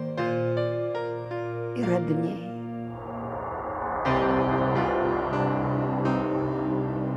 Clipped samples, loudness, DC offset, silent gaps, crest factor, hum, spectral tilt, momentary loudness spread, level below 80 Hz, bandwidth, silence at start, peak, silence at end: under 0.1%; -27 LUFS; under 0.1%; none; 16 dB; none; -8.5 dB/octave; 10 LU; -50 dBFS; 8 kHz; 0 s; -10 dBFS; 0 s